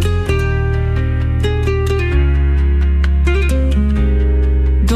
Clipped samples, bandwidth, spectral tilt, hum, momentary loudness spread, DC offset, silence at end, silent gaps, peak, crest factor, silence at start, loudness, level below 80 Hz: under 0.1%; 10 kHz; -7.5 dB/octave; none; 2 LU; under 0.1%; 0 s; none; -4 dBFS; 10 dB; 0 s; -15 LUFS; -14 dBFS